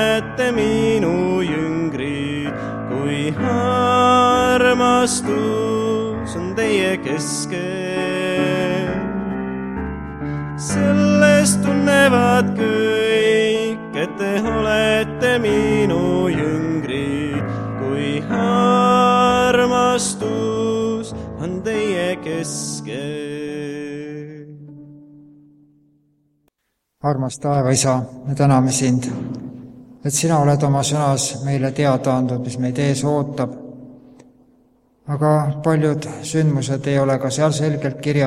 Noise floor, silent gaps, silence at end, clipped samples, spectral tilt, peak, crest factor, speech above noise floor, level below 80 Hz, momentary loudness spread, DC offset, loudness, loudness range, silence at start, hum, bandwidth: -74 dBFS; none; 0 s; under 0.1%; -5 dB/octave; -2 dBFS; 18 dB; 56 dB; -44 dBFS; 12 LU; under 0.1%; -18 LUFS; 8 LU; 0 s; none; 15 kHz